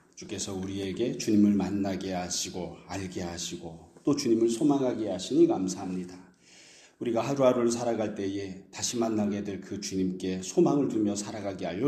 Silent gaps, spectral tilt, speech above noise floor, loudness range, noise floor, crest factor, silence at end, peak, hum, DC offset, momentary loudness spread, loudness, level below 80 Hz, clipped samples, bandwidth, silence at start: none; -5 dB/octave; 27 dB; 2 LU; -55 dBFS; 18 dB; 0 s; -12 dBFS; none; under 0.1%; 12 LU; -29 LUFS; -64 dBFS; under 0.1%; 14 kHz; 0.15 s